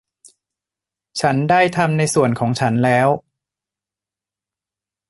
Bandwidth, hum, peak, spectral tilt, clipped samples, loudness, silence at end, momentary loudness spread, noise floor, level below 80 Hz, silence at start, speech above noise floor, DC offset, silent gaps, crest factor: 12 kHz; none; -2 dBFS; -5.5 dB/octave; under 0.1%; -17 LUFS; 1.9 s; 6 LU; -89 dBFS; -56 dBFS; 1.15 s; 73 dB; under 0.1%; none; 18 dB